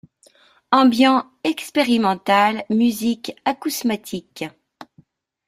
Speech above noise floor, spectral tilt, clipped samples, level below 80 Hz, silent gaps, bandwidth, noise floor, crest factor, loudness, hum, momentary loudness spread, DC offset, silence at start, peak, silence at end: 37 dB; -4 dB/octave; under 0.1%; -64 dBFS; none; 16 kHz; -56 dBFS; 20 dB; -19 LUFS; none; 14 LU; under 0.1%; 0.7 s; 0 dBFS; 0.65 s